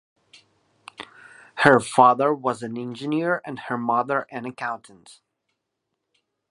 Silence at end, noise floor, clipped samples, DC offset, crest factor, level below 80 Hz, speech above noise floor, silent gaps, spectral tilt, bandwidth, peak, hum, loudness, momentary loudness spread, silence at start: 1.75 s; -80 dBFS; under 0.1%; under 0.1%; 24 dB; -68 dBFS; 58 dB; none; -5.5 dB/octave; 11.5 kHz; 0 dBFS; none; -22 LUFS; 23 LU; 1 s